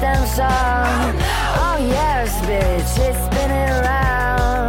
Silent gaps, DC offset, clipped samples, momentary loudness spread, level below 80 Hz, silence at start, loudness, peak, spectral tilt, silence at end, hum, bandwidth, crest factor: none; under 0.1%; under 0.1%; 2 LU; -22 dBFS; 0 s; -18 LUFS; -4 dBFS; -5 dB/octave; 0 s; none; 17 kHz; 12 dB